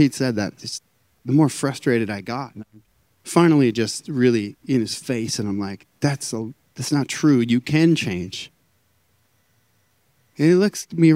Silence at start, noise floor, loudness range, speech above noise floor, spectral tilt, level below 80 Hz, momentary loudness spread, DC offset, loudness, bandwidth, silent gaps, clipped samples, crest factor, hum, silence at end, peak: 0 s; -64 dBFS; 3 LU; 45 dB; -5.5 dB/octave; -64 dBFS; 15 LU; under 0.1%; -21 LUFS; 16 kHz; none; under 0.1%; 20 dB; none; 0 s; 0 dBFS